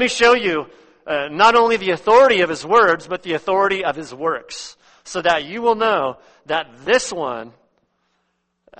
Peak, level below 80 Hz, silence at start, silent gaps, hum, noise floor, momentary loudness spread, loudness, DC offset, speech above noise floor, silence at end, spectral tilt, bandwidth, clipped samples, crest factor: -2 dBFS; -56 dBFS; 0 s; none; none; -70 dBFS; 14 LU; -17 LUFS; under 0.1%; 53 dB; 1.3 s; -3 dB/octave; 8.8 kHz; under 0.1%; 18 dB